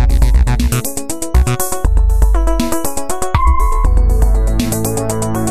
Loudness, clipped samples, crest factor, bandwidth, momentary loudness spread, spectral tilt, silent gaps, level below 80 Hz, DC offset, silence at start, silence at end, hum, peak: -15 LUFS; under 0.1%; 12 dB; 14 kHz; 5 LU; -5.5 dB/octave; none; -14 dBFS; under 0.1%; 0 s; 0 s; none; 0 dBFS